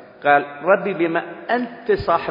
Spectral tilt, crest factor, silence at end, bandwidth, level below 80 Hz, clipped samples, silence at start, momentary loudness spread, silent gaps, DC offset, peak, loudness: -8.5 dB/octave; 18 dB; 0 s; 5.4 kHz; -50 dBFS; under 0.1%; 0 s; 6 LU; none; under 0.1%; -2 dBFS; -20 LUFS